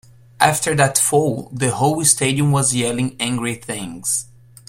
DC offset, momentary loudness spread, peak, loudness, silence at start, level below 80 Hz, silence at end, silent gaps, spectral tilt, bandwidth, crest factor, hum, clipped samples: under 0.1%; 9 LU; 0 dBFS; -18 LUFS; 0.4 s; -52 dBFS; 0.45 s; none; -3.5 dB/octave; 16 kHz; 18 dB; none; under 0.1%